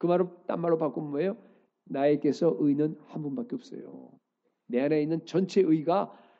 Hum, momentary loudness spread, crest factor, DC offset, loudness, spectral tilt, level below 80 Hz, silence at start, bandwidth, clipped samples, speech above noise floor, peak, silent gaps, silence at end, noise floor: none; 13 LU; 14 dB; under 0.1%; -28 LUFS; -8 dB/octave; -82 dBFS; 0 s; 7.8 kHz; under 0.1%; 34 dB; -14 dBFS; none; 0.25 s; -62 dBFS